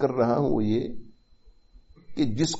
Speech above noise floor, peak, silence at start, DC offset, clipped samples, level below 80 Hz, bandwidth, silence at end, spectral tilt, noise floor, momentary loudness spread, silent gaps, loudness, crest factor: 31 dB; -10 dBFS; 0 s; under 0.1%; under 0.1%; -50 dBFS; 8 kHz; 0 s; -6.5 dB/octave; -55 dBFS; 16 LU; none; -26 LUFS; 16 dB